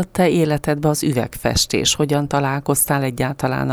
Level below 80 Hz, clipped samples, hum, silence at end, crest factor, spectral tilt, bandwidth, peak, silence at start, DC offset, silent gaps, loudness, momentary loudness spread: -40 dBFS; under 0.1%; none; 0 s; 14 dB; -4.5 dB/octave; over 20 kHz; -4 dBFS; 0 s; under 0.1%; none; -18 LUFS; 5 LU